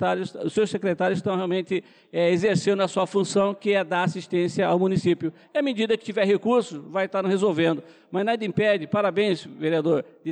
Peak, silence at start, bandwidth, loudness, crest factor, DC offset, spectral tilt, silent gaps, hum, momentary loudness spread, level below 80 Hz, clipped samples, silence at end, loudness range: -12 dBFS; 0 s; 10 kHz; -24 LUFS; 12 dB; under 0.1%; -6 dB/octave; none; none; 6 LU; -68 dBFS; under 0.1%; 0 s; 1 LU